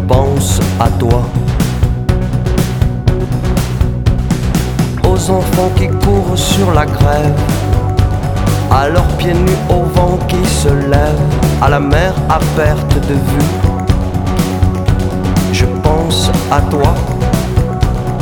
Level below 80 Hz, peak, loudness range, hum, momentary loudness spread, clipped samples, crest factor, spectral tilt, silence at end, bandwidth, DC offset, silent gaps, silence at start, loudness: -18 dBFS; 0 dBFS; 2 LU; none; 4 LU; under 0.1%; 12 dB; -6 dB/octave; 0 s; 19 kHz; under 0.1%; none; 0 s; -13 LUFS